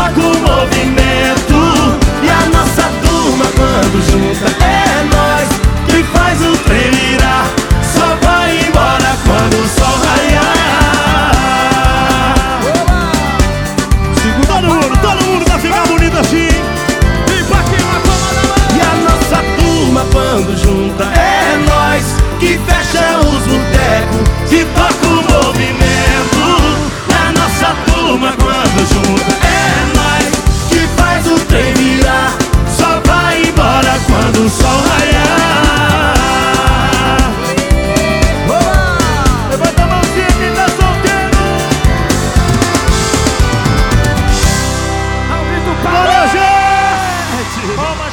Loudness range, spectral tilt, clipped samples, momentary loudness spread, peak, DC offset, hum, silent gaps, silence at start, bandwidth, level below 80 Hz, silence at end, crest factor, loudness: 2 LU; -4.5 dB/octave; under 0.1%; 3 LU; 0 dBFS; under 0.1%; none; none; 0 s; 19.5 kHz; -16 dBFS; 0 s; 10 dB; -10 LUFS